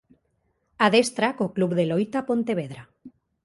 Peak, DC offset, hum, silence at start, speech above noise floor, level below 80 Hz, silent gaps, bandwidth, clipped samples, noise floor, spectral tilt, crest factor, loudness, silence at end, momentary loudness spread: -4 dBFS; under 0.1%; none; 0.8 s; 48 dB; -66 dBFS; none; 11.5 kHz; under 0.1%; -71 dBFS; -5 dB/octave; 22 dB; -23 LUFS; 0.35 s; 10 LU